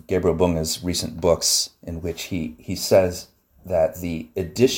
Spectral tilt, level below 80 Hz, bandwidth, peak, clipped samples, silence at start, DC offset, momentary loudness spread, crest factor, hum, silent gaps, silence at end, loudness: -4 dB/octave; -44 dBFS; 17.5 kHz; -4 dBFS; under 0.1%; 0.1 s; under 0.1%; 12 LU; 18 dB; none; none; 0 s; -22 LUFS